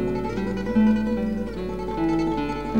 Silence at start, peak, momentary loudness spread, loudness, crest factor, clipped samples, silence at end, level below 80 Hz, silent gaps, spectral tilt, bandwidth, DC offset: 0 s; -10 dBFS; 9 LU; -24 LUFS; 14 dB; under 0.1%; 0 s; -38 dBFS; none; -8 dB/octave; 8.8 kHz; 0.7%